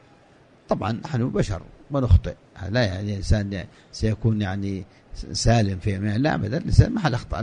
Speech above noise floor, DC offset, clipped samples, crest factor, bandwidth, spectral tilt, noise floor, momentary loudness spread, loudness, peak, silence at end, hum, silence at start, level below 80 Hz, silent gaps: 31 dB; under 0.1%; under 0.1%; 22 dB; 10 kHz; -6.5 dB/octave; -54 dBFS; 14 LU; -24 LUFS; 0 dBFS; 0 s; none; 0.7 s; -32 dBFS; none